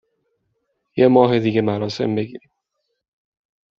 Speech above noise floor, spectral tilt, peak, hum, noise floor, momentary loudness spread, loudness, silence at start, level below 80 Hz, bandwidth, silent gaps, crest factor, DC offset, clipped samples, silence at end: 58 dB; -6 dB/octave; -2 dBFS; none; -75 dBFS; 14 LU; -18 LUFS; 0.95 s; -62 dBFS; 7.4 kHz; none; 20 dB; under 0.1%; under 0.1%; 1.4 s